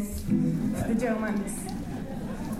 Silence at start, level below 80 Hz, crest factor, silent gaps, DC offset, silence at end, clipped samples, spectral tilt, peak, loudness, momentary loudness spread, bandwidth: 0 s; -44 dBFS; 14 dB; none; under 0.1%; 0 s; under 0.1%; -6.5 dB/octave; -16 dBFS; -29 LUFS; 9 LU; 15.5 kHz